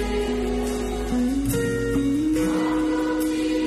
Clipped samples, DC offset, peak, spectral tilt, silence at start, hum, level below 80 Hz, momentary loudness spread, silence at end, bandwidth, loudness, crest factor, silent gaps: under 0.1%; under 0.1%; -12 dBFS; -5.5 dB/octave; 0 s; none; -34 dBFS; 4 LU; 0 s; 13 kHz; -24 LUFS; 10 dB; none